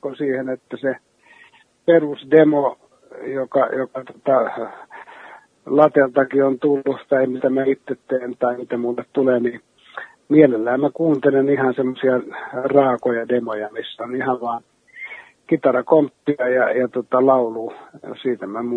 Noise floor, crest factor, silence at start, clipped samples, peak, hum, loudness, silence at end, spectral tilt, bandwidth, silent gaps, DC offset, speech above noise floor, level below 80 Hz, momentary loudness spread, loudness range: -52 dBFS; 20 dB; 0 s; under 0.1%; 0 dBFS; none; -19 LUFS; 0 s; -8.5 dB/octave; 4.2 kHz; none; under 0.1%; 33 dB; -70 dBFS; 18 LU; 3 LU